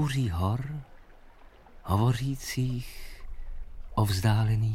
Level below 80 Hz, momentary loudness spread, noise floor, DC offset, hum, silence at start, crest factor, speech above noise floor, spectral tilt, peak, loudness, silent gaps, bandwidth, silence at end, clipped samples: -42 dBFS; 21 LU; -52 dBFS; under 0.1%; none; 0 s; 18 dB; 25 dB; -6 dB/octave; -10 dBFS; -29 LUFS; none; 16.5 kHz; 0 s; under 0.1%